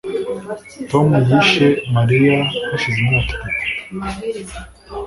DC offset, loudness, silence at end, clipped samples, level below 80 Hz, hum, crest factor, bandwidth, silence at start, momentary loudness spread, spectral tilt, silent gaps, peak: under 0.1%; -16 LUFS; 0 s; under 0.1%; -38 dBFS; none; 16 dB; 11.5 kHz; 0.05 s; 17 LU; -6.5 dB/octave; none; 0 dBFS